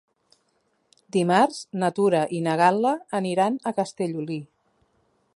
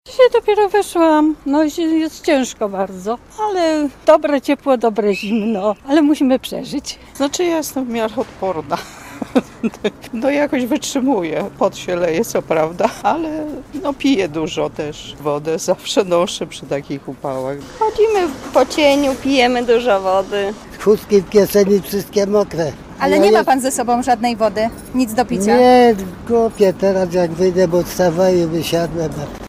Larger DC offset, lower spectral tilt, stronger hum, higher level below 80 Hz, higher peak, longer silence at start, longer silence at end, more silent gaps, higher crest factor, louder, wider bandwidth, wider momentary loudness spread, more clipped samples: neither; about the same, -6 dB/octave vs -5 dB/octave; neither; second, -74 dBFS vs -44 dBFS; second, -4 dBFS vs 0 dBFS; first, 1.15 s vs 0.05 s; first, 0.9 s vs 0 s; neither; about the same, 20 dB vs 16 dB; second, -24 LUFS vs -16 LUFS; second, 11.5 kHz vs 16 kHz; about the same, 9 LU vs 11 LU; neither